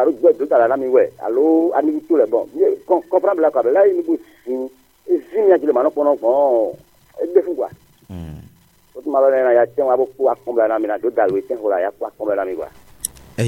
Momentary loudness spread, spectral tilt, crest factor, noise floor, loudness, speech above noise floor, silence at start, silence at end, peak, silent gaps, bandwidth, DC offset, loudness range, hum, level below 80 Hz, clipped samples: 13 LU; -6.5 dB/octave; 16 dB; -50 dBFS; -17 LUFS; 33 dB; 0 s; 0 s; -2 dBFS; none; 16.5 kHz; under 0.1%; 4 LU; none; -54 dBFS; under 0.1%